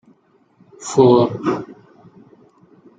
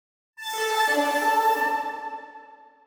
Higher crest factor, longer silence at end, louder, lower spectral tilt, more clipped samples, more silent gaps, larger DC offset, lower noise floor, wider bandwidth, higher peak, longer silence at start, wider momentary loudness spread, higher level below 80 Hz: about the same, 18 dB vs 14 dB; first, 1.25 s vs 0.3 s; first, -16 LUFS vs -24 LUFS; first, -6.5 dB/octave vs 0 dB/octave; neither; neither; neither; first, -56 dBFS vs -48 dBFS; second, 9.4 kHz vs 19.5 kHz; first, -2 dBFS vs -12 dBFS; first, 0.8 s vs 0.4 s; first, 20 LU vs 15 LU; first, -60 dBFS vs -82 dBFS